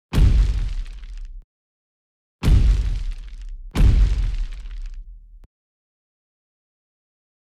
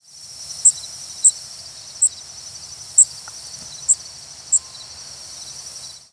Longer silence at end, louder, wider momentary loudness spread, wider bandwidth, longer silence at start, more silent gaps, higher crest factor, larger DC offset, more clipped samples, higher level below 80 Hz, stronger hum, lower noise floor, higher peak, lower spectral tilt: first, 2.1 s vs 0.25 s; second, -22 LUFS vs -16 LUFS; first, 22 LU vs 19 LU; about the same, 10 kHz vs 11 kHz; second, 0.1 s vs 0.4 s; first, 1.44-2.39 s vs none; second, 14 dB vs 20 dB; neither; neither; first, -22 dBFS vs -60 dBFS; neither; about the same, -38 dBFS vs -38 dBFS; second, -8 dBFS vs -2 dBFS; first, -7 dB/octave vs 2 dB/octave